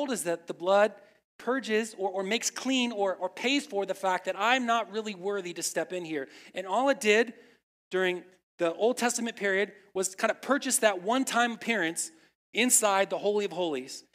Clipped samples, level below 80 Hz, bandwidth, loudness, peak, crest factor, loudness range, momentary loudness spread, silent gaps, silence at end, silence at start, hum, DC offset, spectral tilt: under 0.1%; -86 dBFS; 16 kHz; -28 LUFS; -8 dBFS; 20 dB; 3 LU; 10 LU; 1.24-1.39 s, 7.63-7.91 s, 8.43-8.58 s, 12.35-12.53 s; 0.15 s; 0 s; none; under 0.1%; -2 dB/octave